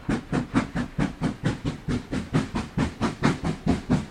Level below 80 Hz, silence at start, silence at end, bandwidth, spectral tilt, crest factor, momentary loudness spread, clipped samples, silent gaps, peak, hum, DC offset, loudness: -40 dBFS; 0 s; 0 s; 12.5 kHz; -6.5 dB/octave; 20 dB; 4 LU; under 0.1%; none; -8 dBFS; none; under 0.1%; -27 LUFS